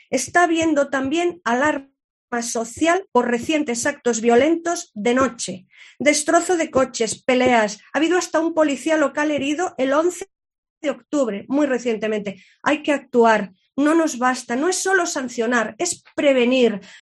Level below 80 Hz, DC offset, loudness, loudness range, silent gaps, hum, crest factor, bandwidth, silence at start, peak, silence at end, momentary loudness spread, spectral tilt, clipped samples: -60 dBFS; under 0.1%; -20 LUFS; 3 LU; 2.04-2.28 s, 10.58-10.63 s, 10.70-10.81 s; none; 18 dB; 12.5 kHz; 0.1 s; -2 dBFS; 0.05 s; 9 LU; -3 dB/octave; under 0.1%